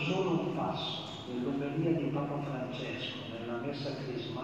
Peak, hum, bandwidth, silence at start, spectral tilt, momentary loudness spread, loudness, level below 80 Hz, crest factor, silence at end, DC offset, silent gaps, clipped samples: -18 dBFS; none; 8.4 kHz; 0 s; -6.5 dB/octave; 7 LU; -35 LUFS; -68 dBFS; 16 dB; 0 s; under 0.1%; none; under 0.1%